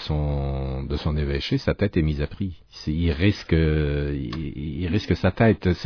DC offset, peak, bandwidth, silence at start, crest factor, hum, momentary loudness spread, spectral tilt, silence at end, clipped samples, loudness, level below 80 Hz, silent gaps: under 0.1%; -6 dBFS; 5.4 kHz; 0 s; 16 dB; none; 10 LU; -8 dB/octave; 0 s; under 0.1%; -24 LUFS; -32 dBFS; none